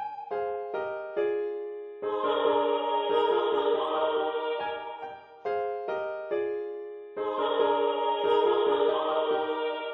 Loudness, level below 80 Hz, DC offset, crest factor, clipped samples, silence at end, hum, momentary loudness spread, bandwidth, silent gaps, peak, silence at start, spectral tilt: -28 LUFS; -76 dBFS; under 0.1%; 16 dB; under 0.1%; 0 s; none; 11 LU; 5.2 kHz; none; -12 dBFS; 0 s; -6 dB/octave